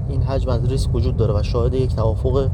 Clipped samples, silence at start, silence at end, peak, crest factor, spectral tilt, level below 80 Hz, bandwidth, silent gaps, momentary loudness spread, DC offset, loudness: under 0.1%; 0 s; 0 s; -4 dBFS; 14 dB; -8 dB/octave; -24 dBFS; 11 kHz; none; 1 LU; under 0.1%; -20 LUFS